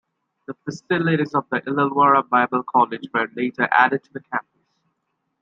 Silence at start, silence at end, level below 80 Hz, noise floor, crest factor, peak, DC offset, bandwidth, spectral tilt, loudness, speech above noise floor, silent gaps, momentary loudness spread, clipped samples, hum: 0.5 s; 1 s; -70 dBFS; -75 dBFS; 20 dB; -2 dBFS; under 0.1%; 7.6 kHz; -6.5 dB/octave; -20 LUFS; 54 dB; none; 13 LU; under 0.1%; none